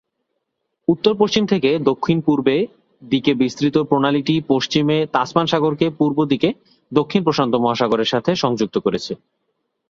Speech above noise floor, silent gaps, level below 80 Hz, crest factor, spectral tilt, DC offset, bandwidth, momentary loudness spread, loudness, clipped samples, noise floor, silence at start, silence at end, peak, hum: 57 dB; none; -56 dBFS; 16 dB; -6 dB/octave; under 0.1%; 7.6 kHz; 5 LU; -18 LUFS; under 0.1%; -74 dBFS; 0.9 s; 0.75 s; -2 dBFS; none